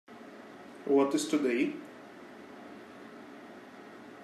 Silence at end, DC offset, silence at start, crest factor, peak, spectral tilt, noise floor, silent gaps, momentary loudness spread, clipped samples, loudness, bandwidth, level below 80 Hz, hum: 0 s; under 0.1%; 0.1 s; 18 dB; -16 dBFS; -4 dB/octave; -50 dBFS; none; 22 LU; under 0.1%; -30 LUFS; 13.5 kHz; -86 dBFS; none